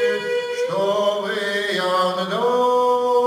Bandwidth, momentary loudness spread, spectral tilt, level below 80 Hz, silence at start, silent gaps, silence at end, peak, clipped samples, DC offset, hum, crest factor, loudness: 16 kHz; 5 LU; -4 dB/octave; -72 dBFS; 0 s; none; 0 s; -8 dBFS; under 0.1%; under 0.1%; none; 12 dB; -20 LUFS